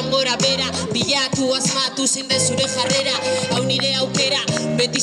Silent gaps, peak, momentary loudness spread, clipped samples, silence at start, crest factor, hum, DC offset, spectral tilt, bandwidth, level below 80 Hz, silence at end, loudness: none; -4 dBFS; 3 LU; under 0.1%; 0 s; 16 dB; none; under 0.1%; -2.5 dB/octave; 15.5 kHz; -54 dBFS; 0 s; -18 LUFS